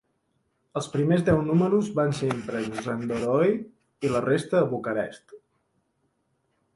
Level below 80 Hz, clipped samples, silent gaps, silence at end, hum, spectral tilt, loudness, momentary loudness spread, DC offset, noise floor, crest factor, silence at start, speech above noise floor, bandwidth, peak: -56 dBFS; under 0.1%; none; 1.4 s; none; -7 dB/octave; -26 LUFS; 10 LU; under 0.1%; -73 dBFS; 18 dB; 0.75 s; 48 dB; 11.5 kHz; -8 dBFS